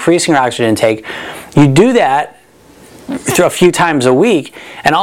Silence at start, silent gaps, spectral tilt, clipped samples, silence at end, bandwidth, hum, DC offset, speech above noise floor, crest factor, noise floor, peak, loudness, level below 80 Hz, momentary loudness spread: 0 s; none; -5 dB/octave; 0.2%; 0 s; 17 kHz; none; under 0.1%; 31 dB; 12 dB; -41 dBFS; 0 dBFS; -11 LUFS; -42 dBFS; 15 LU